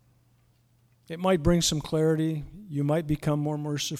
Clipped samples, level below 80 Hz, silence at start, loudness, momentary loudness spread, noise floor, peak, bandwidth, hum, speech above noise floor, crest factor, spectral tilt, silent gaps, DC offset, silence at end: under 0.1%; -44 dBFS; 1.1 s; -27 LUFS; 9 LU; -64 dBFS; -10 dBFS; 15 kHz; none; 38 dB; 18 dB; -5.5 dB/octave; none; under 0.1%; 0 s